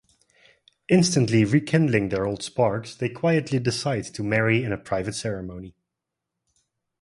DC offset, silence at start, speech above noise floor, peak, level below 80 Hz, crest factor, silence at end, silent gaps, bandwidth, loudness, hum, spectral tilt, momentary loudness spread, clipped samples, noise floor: under 0.1%; 0.9 s; 61 dB; -4 dBFS; -54 dBFS; 20 dB; 1.3 s; none; 11.5 kHz; -23 LUFS; none; -5.5 dB/octave; 10 LU; under 0.1%; -84 dBFS